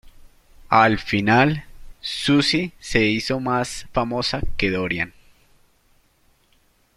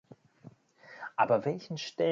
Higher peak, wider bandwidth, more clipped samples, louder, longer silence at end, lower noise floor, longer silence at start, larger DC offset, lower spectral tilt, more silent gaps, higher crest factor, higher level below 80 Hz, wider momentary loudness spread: first, -2 dBFS vs -12 dBFS; first, 14 kHz vs 7.6 kHz; neither; first, -21 LUFS vs -31 LUFS; first, 1.9 s vs 0 s; first, -61 dBFS vs -56 dBFS; second, 0.05 s vs 0.45 s; neither; about the same, -5 dB/octave vs -5.5 dB/octave; neither; about the same, 22 dB vs 22 dB; first, -40 dBFS vs -78 dBFS; second, 9 LU vs 17 LU